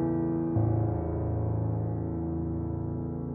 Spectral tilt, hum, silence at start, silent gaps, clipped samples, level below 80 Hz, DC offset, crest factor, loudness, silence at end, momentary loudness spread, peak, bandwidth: -14.5 dB/octave; none; 0 s; none; under 0.1%; -42 dBFS; under 0.1%; 14 dB; -31 LUFS; 0 s; 6 LU; -16 dBFS; 2.4 kHz